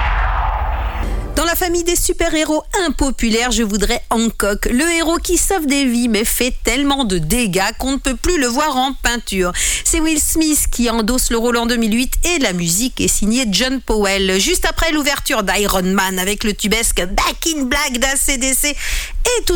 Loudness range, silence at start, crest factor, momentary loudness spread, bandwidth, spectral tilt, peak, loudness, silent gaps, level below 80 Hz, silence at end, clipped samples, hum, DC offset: 1 LU; 0 s; 12 dB; 4 LU; 19 kHz; -3 dB/octave; -4 dBFS; -16 LUFS; none; -24 dBFS; 0 s; under 0.1%; none; under 0.1%